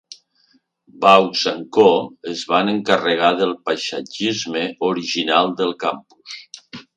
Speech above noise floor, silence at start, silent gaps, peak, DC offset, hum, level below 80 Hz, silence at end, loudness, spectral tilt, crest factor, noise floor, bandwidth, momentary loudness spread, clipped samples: 42 dB; 0.1 s; none; 0 dBFS; under 0.1%; none; -68 dBFS; 0.15 s; -18 LUFS; -4 dB/octave; 20 dB; -60 dBFS; 9.8 kHz; 21 LU; under 0.1%